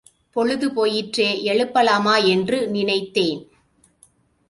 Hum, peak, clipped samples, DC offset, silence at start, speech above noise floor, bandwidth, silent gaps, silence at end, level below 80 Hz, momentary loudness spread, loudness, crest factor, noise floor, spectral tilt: none; -4 dBFS; under 0.1%; under 0.1%; 0.35 s; 40 dB; 11.5 kHz; none; 1.05 s; -62 dBFS; 7 LU; -20 LUFS; 16 dB; -59 dBFS; -4.5 dB/octave